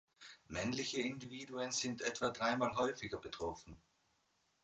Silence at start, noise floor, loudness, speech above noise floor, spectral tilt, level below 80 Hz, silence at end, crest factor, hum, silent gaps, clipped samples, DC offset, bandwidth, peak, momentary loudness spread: 0.2 s; -79 dBFS; -40 LUFS; 39 dB; -3.5 dB/octave; -66 dBFS; 0.85 s; 20 dB; none; none; under 0.1%; under 0.1%; 9.2 kHz; -22 dBFS; 14 LU